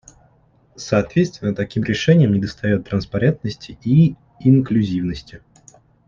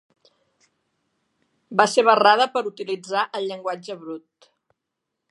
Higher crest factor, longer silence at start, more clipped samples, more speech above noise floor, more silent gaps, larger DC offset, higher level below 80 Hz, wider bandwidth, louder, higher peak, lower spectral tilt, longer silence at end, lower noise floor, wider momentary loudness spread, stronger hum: second, 16 dB vs 22 dB; second, 0.8 s vs 1.7 s; neither; second, 38 dB vs 60 dB; neither; neither; first, -46 dBFS vs -82 dBFS; second, 7.4 kHz vs 11.5 kHz; about the same, -19 LUFS vs -20 LUFS; about the same, -2 dBFS vs 0 dBFS; first, -7.5 dB/octave vs -3 dB/octave; second, 0.7 s vs 1.1 s; second, -56 dBFS vs -81 dBFS; second, 12 LU vs 19 LU; neither